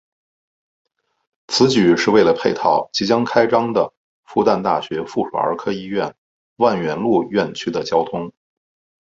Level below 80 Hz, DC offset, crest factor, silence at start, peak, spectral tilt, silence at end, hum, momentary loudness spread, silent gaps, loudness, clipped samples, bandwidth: -58 dBFS; under 0.1%; 18 dB; 1.5 s; -2 dBFS; -5 dB/octave; 0.7 s; none; 10 LU; 3.97-4.23 s, 6.18-6.56 s; -18 LUFS; under 0.1%; 8 kHz